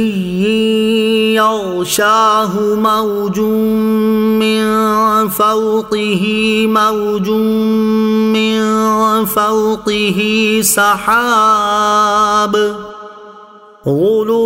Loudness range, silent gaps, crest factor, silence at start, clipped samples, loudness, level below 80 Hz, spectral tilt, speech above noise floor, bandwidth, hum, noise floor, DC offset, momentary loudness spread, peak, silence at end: 2 LU; none; 12 dB; 0 s; under 0.1%; -12 LUFS; -48 dBFS; -4 dB/octave; 26 dB; 16.5 kHz; none; -38 dBFS; under 0.1%; 5 LU; 0 dBFS; 0 s